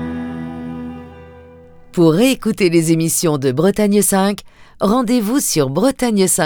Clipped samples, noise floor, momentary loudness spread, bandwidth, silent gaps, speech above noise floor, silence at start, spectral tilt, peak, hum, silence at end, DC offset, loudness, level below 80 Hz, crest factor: under 0.1%; -41 dBFS; 14 LU; over 20 kHz; none; 26 dB; 0 s; -5 dB/octave; 0 dBFS; none; 0 s; under 0.1%; -15 LUFS; -46 dBFS; 16 dB